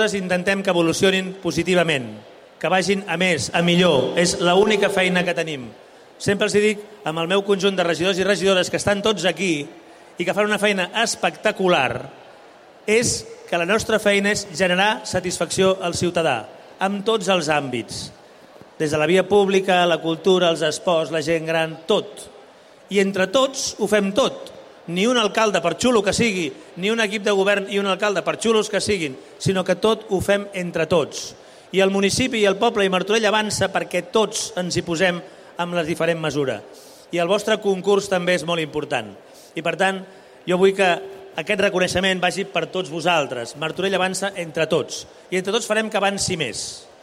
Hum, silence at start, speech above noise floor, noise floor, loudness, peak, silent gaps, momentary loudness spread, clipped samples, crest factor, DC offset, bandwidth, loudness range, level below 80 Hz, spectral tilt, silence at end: none; 0 s; 27 dB; -47 dBFS; -20 LUFS; -4 dBFS; none; 10 LU; under 0.1%; 18 dB; under 0.1%; 16 kHz; 3 LU; -54 dBFS; -4 dB/octave; 0.2 s